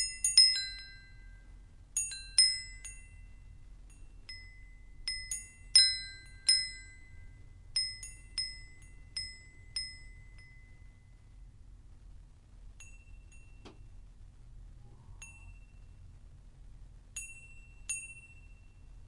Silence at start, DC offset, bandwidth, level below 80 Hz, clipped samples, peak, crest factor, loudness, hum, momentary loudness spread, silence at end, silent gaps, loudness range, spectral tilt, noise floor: 0 s; under 0.1%; 11.5 kHz; -54 dBFS; under 0.1%; -8 dBFS; 28 dB; -29 LUFS; none; 28 LU; 0.05 s; none; 21 LU; 1.5 dB/octave; -55 dBFS